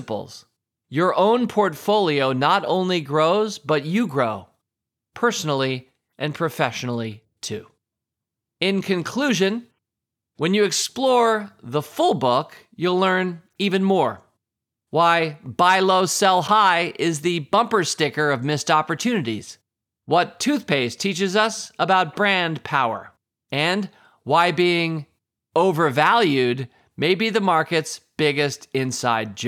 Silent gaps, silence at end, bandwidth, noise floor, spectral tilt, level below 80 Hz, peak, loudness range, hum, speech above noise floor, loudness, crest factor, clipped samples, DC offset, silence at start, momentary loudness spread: none; 0 s; 16.5 kHz; -85 dBFS; -4.5 dB/octave; -74 dBFS; -2 dBFS; 7 LU; none; 65 dB; -20 LUFS; 18 dB; under 0.1%; under 0.1%; 0 s; 12 LU